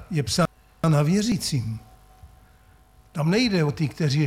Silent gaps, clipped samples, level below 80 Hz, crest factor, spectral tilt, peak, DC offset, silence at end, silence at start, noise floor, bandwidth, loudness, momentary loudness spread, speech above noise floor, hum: none; under 0.1%; -50 dBFS; 16 dB; -5.5 dB/octave; -8 dBFS; under 0.1%; 0 s; 0 s; -54 dBFS; 15.5 kHz; -23 LUFS; 9 LU; 32 dB; none